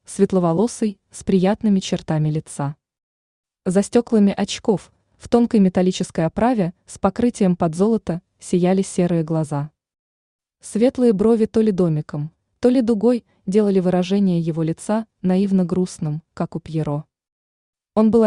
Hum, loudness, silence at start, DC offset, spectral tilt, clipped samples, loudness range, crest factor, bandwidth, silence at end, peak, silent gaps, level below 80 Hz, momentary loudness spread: none; -20 LUFS; 0.1 s; under 0.1%; -7 dB/octave; under 0.1%; 3 LU; 16 dB; 11 kHz; 0 s; -2 dBFS; 3.03-3.44 s, 9.99-10.39 s, 17.32-17.73 s; -52 dBFS; 11 LU